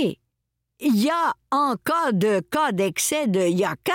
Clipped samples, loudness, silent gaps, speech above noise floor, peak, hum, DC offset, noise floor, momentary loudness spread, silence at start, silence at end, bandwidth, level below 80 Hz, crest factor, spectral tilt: under 0.1%; -22 LUFS; none; 57 dB; -12 dBFS; none; under 0.1%; -79 dBFS; 3 LU; 0 s; 0 s; 17 kHz; -66 dBFS; 12 dB; -4.5 dB/octave